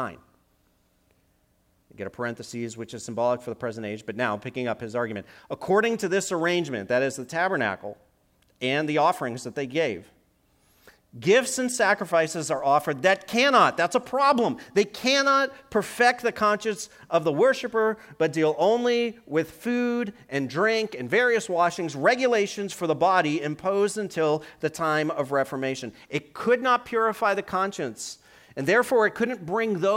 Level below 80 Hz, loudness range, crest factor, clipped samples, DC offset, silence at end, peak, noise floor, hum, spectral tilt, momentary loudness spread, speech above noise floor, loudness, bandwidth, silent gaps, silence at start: -66 dBFS; 8 LU; 20 dB; under 0.1%; under 0.1%; 0 s; -6 dBFS; -66 dBFS; none; -4 dB/octave; 11 LU; 42 dB; -25 LUFS; 16.5 kHz; none; 0 s